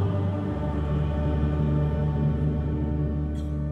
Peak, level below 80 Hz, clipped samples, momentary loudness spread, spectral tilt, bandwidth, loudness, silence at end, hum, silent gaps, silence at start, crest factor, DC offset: -14 dBFS; -30 dBFS; under 0.1%; 4 LU; -10 dB/octave; 4.4 kHz; -27 LUFS; 0 s; none; none; 0 s; 12 dB; under 0.1%